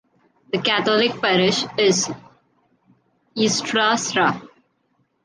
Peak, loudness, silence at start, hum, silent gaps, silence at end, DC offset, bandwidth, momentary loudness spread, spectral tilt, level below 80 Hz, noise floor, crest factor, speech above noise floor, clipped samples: -4 dBFS; -19 LUFS; 0.55 s; none; none; 0.8 s; under 0.1%; 10.5 kHz; 10 LU; -3 dB/octave; -64 dBFS; -67 dBFS; 18 dB; 47 dB; under 0.1%